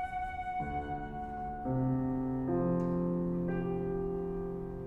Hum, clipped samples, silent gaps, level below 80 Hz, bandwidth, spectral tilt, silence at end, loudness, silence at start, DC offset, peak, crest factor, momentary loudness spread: none; under 0.1%; none; -48 dBFS; 3.9 kHz; -10.5 dB/octave; 0 s; -35 LUFS; 0 s; under 0.1%; -20 dBFS; 14 dB; 8 LU